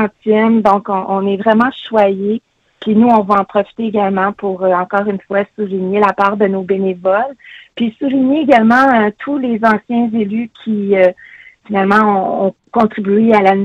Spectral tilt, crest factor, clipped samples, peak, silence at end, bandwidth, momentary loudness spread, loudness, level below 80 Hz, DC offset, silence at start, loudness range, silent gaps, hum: -8 dB/octave; 14 dB; under 0.1%; 0 dBFS; 0 s; 6.8 kHz; 9 LU; -13 LUFS; -56 dBFS; under 0.1%; 0 s; 2 LU; none; none